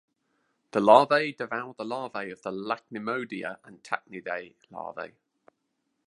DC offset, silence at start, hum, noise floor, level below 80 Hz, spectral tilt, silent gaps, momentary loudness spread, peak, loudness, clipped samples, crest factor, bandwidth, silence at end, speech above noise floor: under 0.1%; 0.75 s; none; -78 dBFS; -78 dBFS; -5.5 dB/octave; none; 21 LU; -2 dBFS; -27 LUFS; under 0.1%; 26 dB; 11 kHz; 1 s; 51 dB